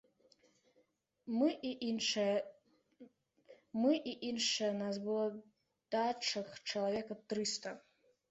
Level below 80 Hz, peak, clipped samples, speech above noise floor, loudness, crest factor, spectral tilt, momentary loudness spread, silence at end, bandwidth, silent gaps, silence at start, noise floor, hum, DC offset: -82 dBFS; -22 dBFS; under 0.1%; 40 dB; -37 LUFS; 18 dB; -3.5 dB/octave; 9 LU; 0.5 s; 8.2 kHz; none; 1.25 s; -76 dBFS; none; under 0.1%